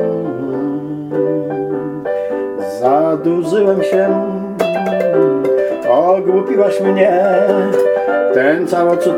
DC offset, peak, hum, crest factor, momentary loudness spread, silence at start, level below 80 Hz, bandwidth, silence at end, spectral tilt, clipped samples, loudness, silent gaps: under 0.1%; 0 dBFS; none; 14 dB; 8 LU; 0 s; -58 dBFS; 15.5 kHz; 0 s; -7 dB/octave; under 0.1%; -14 LUFS; none